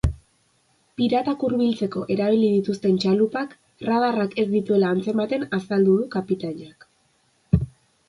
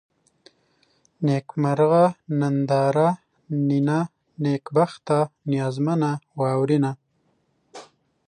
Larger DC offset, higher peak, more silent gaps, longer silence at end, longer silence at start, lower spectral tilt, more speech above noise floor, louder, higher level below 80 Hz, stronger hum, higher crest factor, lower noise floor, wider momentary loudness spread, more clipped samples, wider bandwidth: neither; about the same, -4 dBFS vs -6 dBFS; neither; about the same, 0.4 s vs 0.45 s; second, 0.05 s vs 1.2 s; about the same, -8 dB/octave vs -8 dB/octave; about the same, 43 dB vs 46 dB; about the same, -22 LUFS vs -23 LUFS; first, -40 dBFS vs -70 dBFS; neither; about the same, 20 dB vs 16 dB; second, -64 dBFS vs -68 dBFS; first, 11 LU vs 8 LU; neither; first, 11.5 kHz vs 9.8 kHz